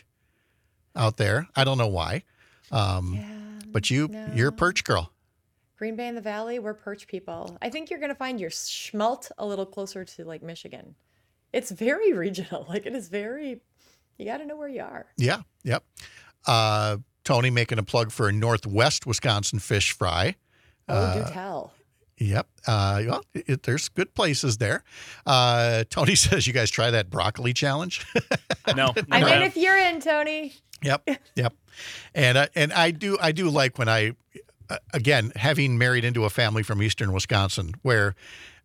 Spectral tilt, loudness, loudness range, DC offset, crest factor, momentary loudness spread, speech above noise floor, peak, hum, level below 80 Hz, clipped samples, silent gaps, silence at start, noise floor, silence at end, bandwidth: -4 dB/octave; -24 LUFS; 10 LU; under 0.1%; 24 dB; 16 LU; 47 dB; -2 dBFS; none; -54 dBFS; under 0.1%; none; 0.95 s; -72 dBFS; 0.15 s; 15.5 kHz